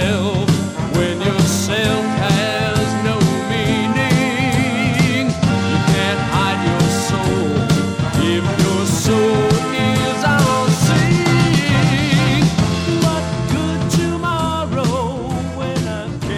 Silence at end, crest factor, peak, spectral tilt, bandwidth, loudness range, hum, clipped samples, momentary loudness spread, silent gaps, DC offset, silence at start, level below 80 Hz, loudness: 0 s; 14 dB; -2 dBFS; -5.5 dB/octave; 16.5 kHz; 2 LU; none; under 0.1%; 5 LU; none; under 0.1%; 0 s; -36 dBFS; -16 LUFS